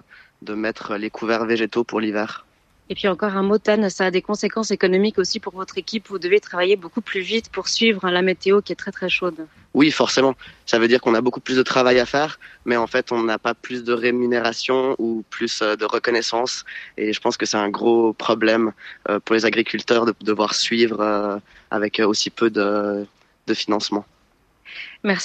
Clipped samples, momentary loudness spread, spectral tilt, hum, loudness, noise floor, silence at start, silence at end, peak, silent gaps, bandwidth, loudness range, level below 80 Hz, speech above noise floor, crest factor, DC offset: under 0.1%; 10 LU; -4 dB/octave; none; -20 LUFS; -60 dBFS; 0.4 s; 0 s; -2 dBFS; none; 8.8 kHz; 3 LU; -60 dBFS; 40 dB; 18 dB; under 0.1%